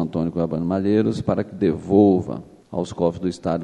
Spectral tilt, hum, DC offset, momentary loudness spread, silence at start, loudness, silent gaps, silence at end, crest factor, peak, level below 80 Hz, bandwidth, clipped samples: -8.5 dB/octave; none; under 0.1%; 13 LU; 0 s; -21 LUFS; none; 0 s; 18 dB; -2 dBFS; -50 dBFS; 10 kHz; under 0.1%